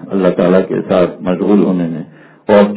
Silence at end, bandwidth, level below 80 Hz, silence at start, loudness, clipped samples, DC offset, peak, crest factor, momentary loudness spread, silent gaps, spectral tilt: 0 s; 4 kHz; -48 dBFS; 0 s; -13 LUFS; 0.3%; under 0.1%; 0 dBFS; 12 dB; 14 LU; none; -11.5 dB/octave